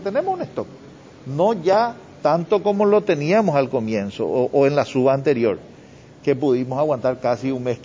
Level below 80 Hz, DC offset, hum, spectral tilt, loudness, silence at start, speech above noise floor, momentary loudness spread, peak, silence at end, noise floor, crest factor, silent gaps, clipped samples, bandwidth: -58 dBFS; under 0.1%; none; -7.5 dB/octave; -20 LUFS; 0 s; 25 dB; 9 LU; -4 dBFS; 0 s; -44 dBFS; 16 dB; none; under 0.1%; 7.6 kHz